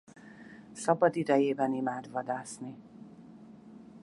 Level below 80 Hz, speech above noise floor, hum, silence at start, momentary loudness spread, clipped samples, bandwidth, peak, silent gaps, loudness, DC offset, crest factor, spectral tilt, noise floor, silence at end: -76 dBFS; 22 dB; none; 0.25 s; 25 LU; under 0.1%; 11.5 kHz; -10 dBFS; none; -30 LUFS; under 0.1%; 22 dB; -6 dB/octave; -52 dBFS; 0.05 s